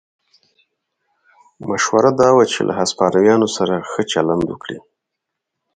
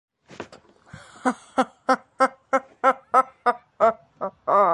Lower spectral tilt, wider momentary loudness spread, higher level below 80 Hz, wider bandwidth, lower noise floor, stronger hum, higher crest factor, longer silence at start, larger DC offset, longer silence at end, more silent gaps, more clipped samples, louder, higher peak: about the same, -4.5 dB/octave vs -4.5 dB/octave; about the same, 15 LU vs 15 LU; first, -54 dBFS vs -68 dBFS; second, 9.4 kHz vs 11.5 kHz; first, -79 dBFS vs -50 dBFS; neither; about the same, 18 dB vs 20 dB; first, 1.6 s vs 0.4 s; neither; first, 0.95 s vs 0 s; neither; neither; first, -16 LUFS vs -23 LUFS; first, 0 dBFS vs -4 dBFS